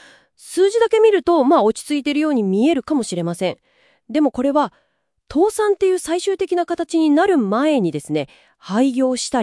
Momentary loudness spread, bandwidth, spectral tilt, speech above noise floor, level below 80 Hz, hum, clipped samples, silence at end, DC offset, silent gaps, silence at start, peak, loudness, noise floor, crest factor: 10 LU; 12 kHz; -5 dB/octave; 27 dB; -56 dBFS; none; under 0.1%; 0 s; under 0.1%; none; 0.45 s; -4 dBFS; -18 LUFS; -45 dBFS; 14 dB